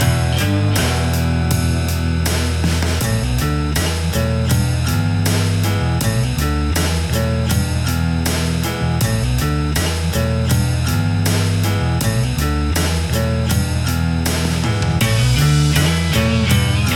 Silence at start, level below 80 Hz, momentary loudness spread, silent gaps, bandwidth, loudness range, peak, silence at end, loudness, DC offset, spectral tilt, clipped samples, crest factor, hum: 0 s; -28 dBFS; 3 LU; none; 17.5 kHz; 2 LU; -2 dBFS; 0 s; -17 LUFS; under 0.1%; -5 dB/octave; under 0.1%; 14 dB; none